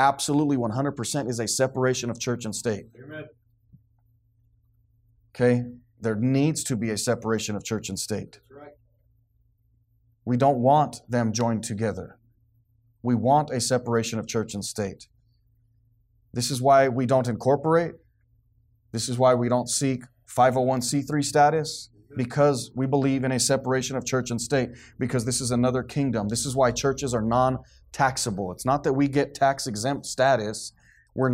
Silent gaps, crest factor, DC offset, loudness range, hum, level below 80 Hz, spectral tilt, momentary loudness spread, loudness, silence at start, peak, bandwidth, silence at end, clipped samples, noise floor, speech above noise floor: none; 18 dB; under 0.1%; 6 LU; none; -56 dBFS; -5 dB/octave; 12 LU; -25 LUFS; 0 s; -8 dBFS; 16 kHz; 0 s; under 0.1%; -65 dBFS; 41 dB